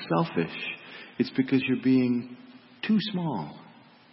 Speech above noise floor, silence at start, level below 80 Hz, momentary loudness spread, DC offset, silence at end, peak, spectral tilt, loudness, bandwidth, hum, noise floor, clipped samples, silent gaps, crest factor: 27 dB; 0 s; -70 dBFS; 17 LU; under 0.1%; 0.5 s; -12 dBFS; -10.5 dB/octave; -27 LUFS; 5.8 kHz; none; -53 dBFS; under 0.1%; none; 16 dB